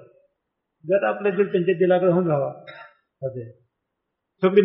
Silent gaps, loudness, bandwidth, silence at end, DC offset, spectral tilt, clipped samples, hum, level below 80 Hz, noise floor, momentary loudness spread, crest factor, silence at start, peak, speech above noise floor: none; -22 LUFS; 5.2 kHz; 0 s; under 0.1%; -6.5 dB/octave; under 0.1%; none; -70 dBFS; -80 dBFS; 22 LU; 18 dB; 0.85 s; -4 dBFS; 59 dB